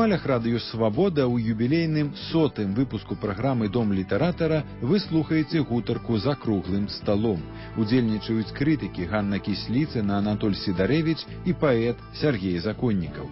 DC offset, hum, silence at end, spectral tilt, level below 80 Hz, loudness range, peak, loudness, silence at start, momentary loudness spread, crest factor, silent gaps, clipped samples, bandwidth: under 0.1%; none; 0 s; -11 dB/octave; -46 dBFS; 1 LU; -10 dBFS; -25 LUFS; 0 s; 5 LU; 14 dB; none; under 0.1%; 5.8 kHz